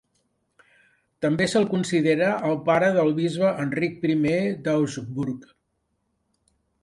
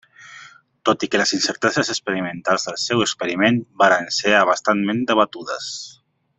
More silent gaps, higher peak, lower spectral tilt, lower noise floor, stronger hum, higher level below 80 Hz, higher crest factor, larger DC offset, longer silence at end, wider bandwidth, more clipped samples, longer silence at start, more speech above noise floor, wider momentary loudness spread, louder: neither; second, -8 dBFS vs -2 dBFS; first, -6 dB/octave vs -3.5 dB/octave; first, -74 dBFS vs -45 dBFS; neither; about the same, -62 dBFS vs -62 dBFS; about the same, 16 dB vs 18 dB; neither; first, 1.4 s vs 0.45 s; first, 11.5 kHz vs 8.4 kHz; neither; first, 1.2 s vs 0.2 s; first, 51 dB vs 26 dB; second, 9 LU vs 12 LU; second, -23 LUFS vs -19 LUFS